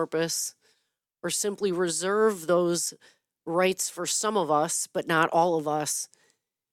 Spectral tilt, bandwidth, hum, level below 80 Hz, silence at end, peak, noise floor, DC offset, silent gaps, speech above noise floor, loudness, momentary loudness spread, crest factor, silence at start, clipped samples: -3 dB/octave; 17.5 kHz; none; -76 dBFS; 0.7 s; -8 dBFS; -77 dBFS; under 0.1%; none; 51 dB; -26 LUFS; 8 LU; 20 dB; 0 s; under 0.1%